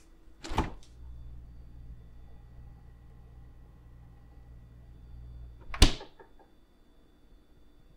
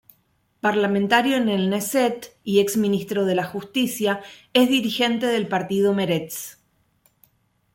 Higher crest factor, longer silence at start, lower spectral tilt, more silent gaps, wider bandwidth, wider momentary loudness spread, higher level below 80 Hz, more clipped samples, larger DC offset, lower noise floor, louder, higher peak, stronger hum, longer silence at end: first, 30 dB vs 18 dB; second, 0.1 s vs 0.65 s; about the same, -4 dB/octave vs -4.5 dB/octave; neither; about the same, 16 kHz vs 17 kHz; first, 28 LU vs 7 LU; first, -38 dBFS vs -64 dBFS; neither; neither; second, -59 dBFS vs -66 dBFS; second, -31 LUFS vs -21 LUFS; about the same, -4 dBFS vs -4 dBFS; neither; second, 0.3 s vs 1.2 s